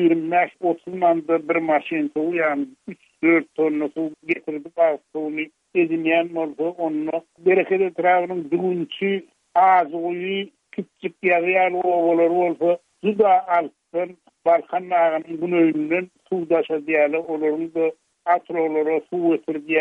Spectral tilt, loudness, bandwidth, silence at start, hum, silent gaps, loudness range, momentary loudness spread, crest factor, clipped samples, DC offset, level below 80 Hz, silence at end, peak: -8 dB/octave; -21 LUFS; 3.9 kHz; 0 s; none; none; 3 LU; 10 LU; 16 dB; under 0.1%; under 0.1%; -74 dBFS; 0 s; -6 dBFS